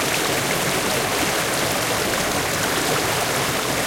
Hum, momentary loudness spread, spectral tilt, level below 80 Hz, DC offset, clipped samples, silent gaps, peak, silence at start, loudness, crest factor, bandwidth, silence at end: none; 1 LU; -2.5 dB/octave; -46 dBFS; under 0.1%; under 0.1%; none; -8 dBFS; 0 s; -20 LUFS; 14 dB; 16.5 kHz; 0 s